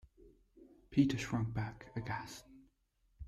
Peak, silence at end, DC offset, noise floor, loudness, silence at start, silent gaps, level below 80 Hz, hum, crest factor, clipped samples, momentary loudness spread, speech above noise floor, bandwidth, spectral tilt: -18 dBFS; 0 s; under 0.1%; -76 dBFS; -37 LUFS; 0.2 s; none; -60 dBFS; none; 22 dB; under 0.1%; 14 LU; 40 dB; 13.5 kHz; -6.5 dB/octave